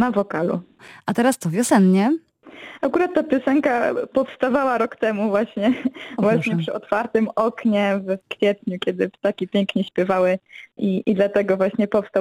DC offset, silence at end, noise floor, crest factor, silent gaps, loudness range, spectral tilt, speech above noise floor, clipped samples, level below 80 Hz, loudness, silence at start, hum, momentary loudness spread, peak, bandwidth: under 0.1%; 0 s; -42 dBFS; 16 dB; none; 2 LU; -6 dB/octave; 22 dB; under 0.1%; -62 dBFS; -21 LUFS; 0 s; none; 7 LU; -4 dBFS; 15.5 kHz